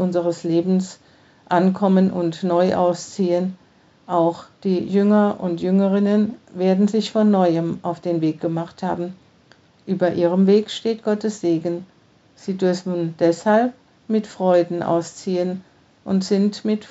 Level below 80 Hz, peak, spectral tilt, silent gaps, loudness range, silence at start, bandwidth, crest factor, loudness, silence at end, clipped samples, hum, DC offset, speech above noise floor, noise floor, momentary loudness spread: -66 dBFS; -4 dBFS; -7 dB/octave; none; 3 LU; 0 s; 8 kHz; 16 dB; -20 LUFS; 0.05 s; under 0.1%; none; under 0.1%; 35 dB; -54 dBFS; 9 LU